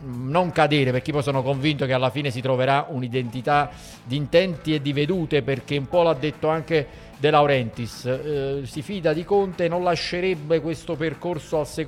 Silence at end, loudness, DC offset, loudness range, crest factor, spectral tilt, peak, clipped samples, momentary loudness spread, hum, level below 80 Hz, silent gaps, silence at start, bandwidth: 0 s; -23 LUFS; under 0.1%; 2 LU; 18 dB; -6.5 dB/octave; -4 dBFS; under 0.1%; 8 LU; none; -50 dBFS; none; 0 s; 14.5 kHz